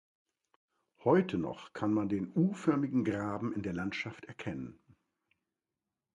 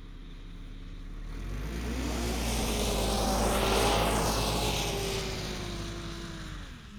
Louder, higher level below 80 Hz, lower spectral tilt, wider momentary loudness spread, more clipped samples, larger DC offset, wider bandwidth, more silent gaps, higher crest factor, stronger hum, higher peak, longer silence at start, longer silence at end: second, -33 LUFS vs -30 LUFS; second, -64 dBFS vs -36 dBFS; first, -8 dB/octave vs -4 dB/octave; second, 13 LU vs 20 LU; neither; neither; second, 10.5 kHz vs over 20 kHz; neither; about the same, 20 dB vs 18 dB; neither; about the same, -14 dBFS vs -14 dBFS; first, 1 s vs 0 s; first, 1.45 s vs 0 s